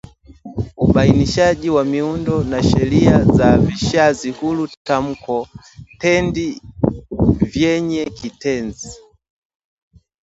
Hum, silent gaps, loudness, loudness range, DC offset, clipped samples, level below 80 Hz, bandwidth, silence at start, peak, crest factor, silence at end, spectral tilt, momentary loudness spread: none; 4.77-4.85 s; -17 LUFS; 6 LU; under 0.1%; under 0.1%; -34 dBFS; 8 kHz; 0.3 s; 0 dBFS; 16 dB; 1.3 s; -6.5 dB/octave; 13 LU